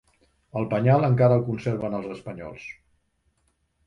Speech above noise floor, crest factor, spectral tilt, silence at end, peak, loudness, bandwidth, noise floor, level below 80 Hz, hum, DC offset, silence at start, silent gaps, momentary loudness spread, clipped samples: 47 dB; 18 dB; -9.5 dB/octave; 1.15 s; -8 dBFS; -23 LUFS; 6.4 kHz; -70 dBFS; -58 dBFS; none; under 0.1%; 0.55 s; none; 18 LU; under 0.1%